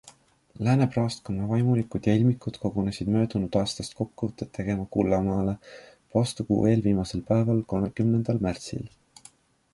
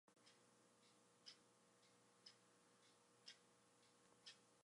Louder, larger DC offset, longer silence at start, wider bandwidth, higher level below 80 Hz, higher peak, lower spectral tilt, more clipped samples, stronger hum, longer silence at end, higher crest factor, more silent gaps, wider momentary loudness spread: first, -26 LUFS vs -66 LUFS; neither; about the same, 0.05 s vs 0.05 s; about the same, 11.5 kHz vs 11.5 kHz; first, -48 dBFS vs under -90 dBFS; first, -8 dBFS vs -46 dBFS; first, -7.5 dB/octave vs -1.5 dB/octave; neither; second, none vs 60 Hz at -85 dBFS; first, 0.85 s vs 0 s; second, 18 dB vs 26 dB; neither; first, 10 LU vs 3 LU